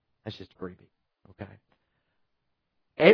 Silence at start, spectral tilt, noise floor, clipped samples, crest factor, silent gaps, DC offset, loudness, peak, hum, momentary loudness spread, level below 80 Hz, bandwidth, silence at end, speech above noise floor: 0.25 s; -4 dB/octave; -78 dBFS; under 0.1%; 24 dB; none; under 0.1%; -31 LUFS; -6 dBFS; none; 13 LU; -70 dBFS; 5.4 kHz; 0 s; 35 dB